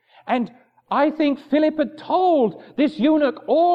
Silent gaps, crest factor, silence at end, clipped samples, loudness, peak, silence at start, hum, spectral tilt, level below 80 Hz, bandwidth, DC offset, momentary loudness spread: none; 14 dB; 0 s; under 0.1%; -20 LUFS; -6 dBFS; 0.25 s; none; -7.5 dB/octave; -68 dBFS; 5.4 kHz; under 0.1%; 7 LU